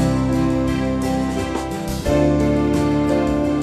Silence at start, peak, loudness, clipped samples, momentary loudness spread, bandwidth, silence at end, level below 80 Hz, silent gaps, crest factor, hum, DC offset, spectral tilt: 0 s; -6 dBFS; -19 LUFS; under 0.1%; 7 LU; 14 kHz; 0 s; -30 dBFS; none; 12 dB; none; under 0.1%; -7 dB/octave